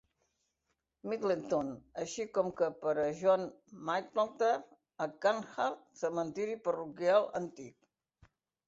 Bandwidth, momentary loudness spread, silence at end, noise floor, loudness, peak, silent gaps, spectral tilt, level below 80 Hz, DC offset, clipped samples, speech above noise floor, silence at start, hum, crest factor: 8 kHz; 12 LU; 0.95 s; -84 dBFS; -34 LUFS; -16 dBFS; none; -5 dB/octave; -76 dBFS; under 0.1%; under 0.1%; 50 dB; 1.05 s; none; 20 dB